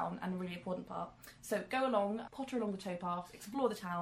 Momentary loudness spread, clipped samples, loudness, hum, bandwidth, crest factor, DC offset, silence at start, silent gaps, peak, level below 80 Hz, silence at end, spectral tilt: 10 LU; under 0.1%; -39 LUFS; none; 15 kHz; 20 dB; under 0.1%; 0 s; none; -20 dBFS; -70 dBFS; 0 s; -5.5 dB/octave